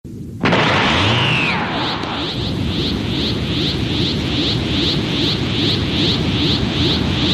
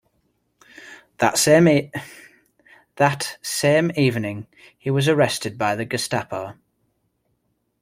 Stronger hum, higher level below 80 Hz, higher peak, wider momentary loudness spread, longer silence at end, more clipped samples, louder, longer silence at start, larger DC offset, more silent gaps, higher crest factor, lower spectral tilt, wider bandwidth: neither; first, -32 dBFS vs -60 dBFS; about the same, -2 dBFS vs -2 dBFS; second, 6 LU vs 19 LU; second, 0 s vs 1.3 s; neither; first, -17 LUFS vs -20 LUFS; second, 0.05 s vs 0.8 s; neither; neither; about the same, 16 dB vs 20 dB; about the same, -5.5 dB/octave vs -4.5 dB/octave; second, 13.5 kHz vs 16.5 kHz